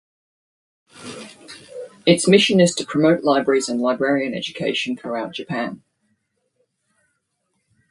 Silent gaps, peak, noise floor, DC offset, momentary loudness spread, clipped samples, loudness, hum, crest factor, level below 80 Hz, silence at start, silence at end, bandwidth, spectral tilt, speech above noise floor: none; -2 dBFS; -72 dBFS; under 0.1%; 23 LU; under 0.1%; -19 LUFS; none; 20 dB; -64 dBFS; 0.95 s; 2.15 s; 11.5 kHz; -4.5 dB/octave; 54 dB